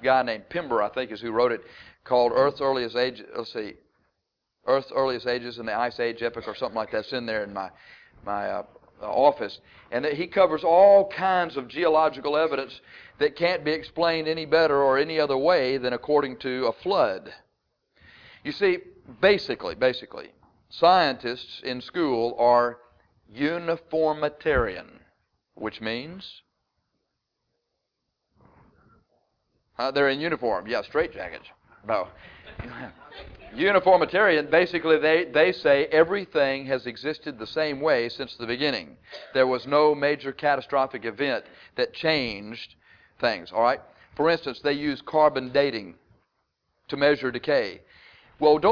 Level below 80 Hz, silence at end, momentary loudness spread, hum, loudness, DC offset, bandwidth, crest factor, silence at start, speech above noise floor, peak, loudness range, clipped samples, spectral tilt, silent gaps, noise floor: -56 dBFS; 0 s; 16 LU; none; -24 LUFS; under 0.1%; 5.4 kHz; 20 dB; 0 s; 56 dB; -6 dBFS; 8 LU; under 0.1%; -6.5 dB/octave; none; -80 dBFS